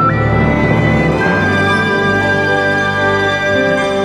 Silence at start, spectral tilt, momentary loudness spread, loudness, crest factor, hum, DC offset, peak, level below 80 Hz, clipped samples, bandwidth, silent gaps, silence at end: 0 s; -6 dB/octave; 1 LU; -12 LUFS; 12 dB; none; under 0.1%; 0 dBFS; -30 dBFS; under 0.1%; 13.5 kHz; none; 0 s